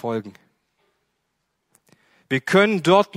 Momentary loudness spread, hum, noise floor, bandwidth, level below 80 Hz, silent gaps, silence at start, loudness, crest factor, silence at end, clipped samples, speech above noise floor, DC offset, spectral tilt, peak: 14 LU; none; -75 dBFS; 15 kHz; -68 dBFS; none; 0.05 s; -19 LUFS; 20 dB; 0 s; under 0.1%; 56 dB; under 0.1%; -5.5 dB/octave; -2 dBFS